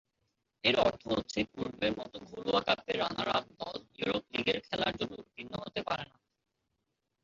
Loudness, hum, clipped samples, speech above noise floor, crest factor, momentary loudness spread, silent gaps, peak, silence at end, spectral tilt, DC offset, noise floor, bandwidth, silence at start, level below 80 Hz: -33 LUFS; none; under 0.1%; 51 dB; 22 dB; 13 LU; none; -12 dBFS; 1.2 s; -2 dB/octave; under 0.1%; -83 dBFS; 7.6 kHz; 0.65 s; -62 dBFS